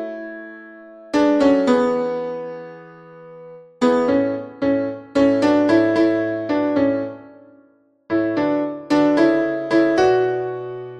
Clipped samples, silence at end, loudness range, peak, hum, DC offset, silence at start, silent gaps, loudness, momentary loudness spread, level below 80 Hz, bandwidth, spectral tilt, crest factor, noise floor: under 0.1%; 0 s; 3 LU; -2 dBFS; none; under 0.1%; 0 s; none; -18 LUFS; 16 LU; -54 dBFS; 9.2 kHz; -6.5 dB/octave; 16 dB; -56 dBFS